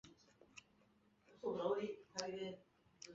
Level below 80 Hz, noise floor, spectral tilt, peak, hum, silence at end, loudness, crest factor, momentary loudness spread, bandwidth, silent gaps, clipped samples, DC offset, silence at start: -82 dBFS; -74 dBFS; -3.5 dB/octave; -24 dBFS; none; 0 s; -45 LUFS; 24 dB; 21 LU; 7.6 kHz; none; under 0.1%; under 0.1%; 0.05 s